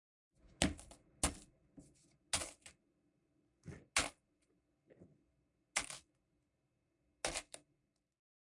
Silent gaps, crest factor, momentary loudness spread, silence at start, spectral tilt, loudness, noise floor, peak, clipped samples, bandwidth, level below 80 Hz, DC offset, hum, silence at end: none; 34 dB; 21 LU; 0.6 s; -2 dB/octave; -41 LUFS; -83 dBFS; -14 dBFS; under 0.1%; 11.5 kHz; -60 dBFS; under 0.1%; none; 0.95 s